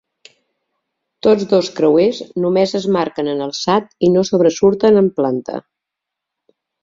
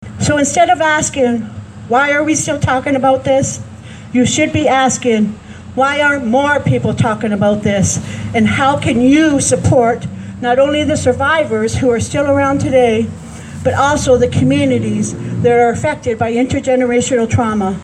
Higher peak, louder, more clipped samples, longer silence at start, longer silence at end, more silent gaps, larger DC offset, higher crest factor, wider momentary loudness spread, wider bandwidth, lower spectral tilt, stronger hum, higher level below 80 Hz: about the same, -2 dBFS vs 0 dBFS; about the same, -15 LUFS vs -13 LUFS; neither; first, 1.25 s vs 0 s; first, 1.25 s vs 0 s; neither; neither; about the same, 14 dB vs 12 dB; about the same, 8 LU vs 8 LU; second, 7.6 kHz vs 12.5 kHz; about the same, -6 dB/octave vs -5 dB/octave; neither; second, -56 dBFS vs -38 dBFS